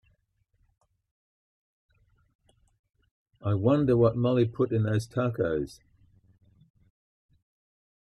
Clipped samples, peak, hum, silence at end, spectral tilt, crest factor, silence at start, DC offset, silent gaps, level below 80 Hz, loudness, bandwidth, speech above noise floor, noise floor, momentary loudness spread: under 0.1%; -12 dBFS; none; 2.3 s; -8.5 dB/octave; 20 dB; 3.45 s; under 0.1%; none; -58 dBFS; -26 LUFS; 12 kHz; 47 dB; -72 dBFS; 9 LU